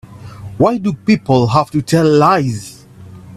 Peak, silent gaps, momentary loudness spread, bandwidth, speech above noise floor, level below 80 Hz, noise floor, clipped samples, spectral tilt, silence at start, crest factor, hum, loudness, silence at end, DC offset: 0 dBFS; none; 19 LU; 14 kHz; 24 dB; -46 dBFS; -37 dBFS; under 0.1%; -7 dB/octave; 0.1 s; 14 dB; none; -13 LUFS; 0 s; under 0.1%